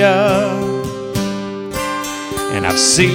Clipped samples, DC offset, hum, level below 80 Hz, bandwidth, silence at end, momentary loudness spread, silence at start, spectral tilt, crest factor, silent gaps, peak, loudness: under 0.1%; under 0.1%; none; -42 dBFS; over 20 kHz; 0 s; 11 LU; 0 s; -3.5 dB/octave; 16 dB; none; 0 dBFS; -17 LUFS